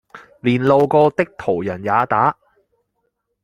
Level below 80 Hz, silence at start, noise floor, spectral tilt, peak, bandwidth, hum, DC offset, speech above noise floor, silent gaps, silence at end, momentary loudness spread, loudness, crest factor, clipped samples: -56 dBFS; 0.15 s; -71 dBFS; -8 dB/octave; -2 dBFS; 10.5 kHz; none; under 0.1%; 55 dB; none; 1.1 s; 8 LU; -17 LUFS; 18 dB; under 0.1%